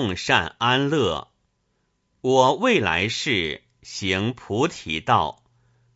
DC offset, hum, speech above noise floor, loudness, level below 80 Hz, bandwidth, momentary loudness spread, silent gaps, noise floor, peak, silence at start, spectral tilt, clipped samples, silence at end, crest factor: under 0.1%; none; 49 dB; -22 LUFS; -52 dBFS; 8 kHz; 11 LU; none; -71 dBFS; -2 dBFS; 0 s; -4.5 dB/octave; under 0.1%; 0.65 s; 22 dB